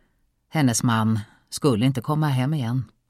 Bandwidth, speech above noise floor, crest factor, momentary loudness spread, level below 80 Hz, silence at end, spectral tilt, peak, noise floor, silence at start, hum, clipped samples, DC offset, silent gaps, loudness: 15.5 kHz; 45 dB; 14 dB; 8 LU; -58 dBFS; 0.25 s; -5.5 dB/octave; -8 dBFS; -66 dBFS; 0.55 s; none; under 0.1%; under 0.1%; none; -23 LUFS